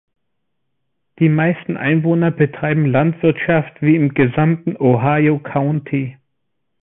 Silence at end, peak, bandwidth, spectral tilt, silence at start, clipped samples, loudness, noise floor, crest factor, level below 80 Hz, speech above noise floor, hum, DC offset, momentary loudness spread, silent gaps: 0.7 s; -2 dBFS; 3.8 kHz; -13.5 dB/octave; 1.2 s; under 0.1%; -16 LUFS; -76 dBFS; 14 dB; -52 dBFS; 60 dB; none; under 0.1%; 5 LU; none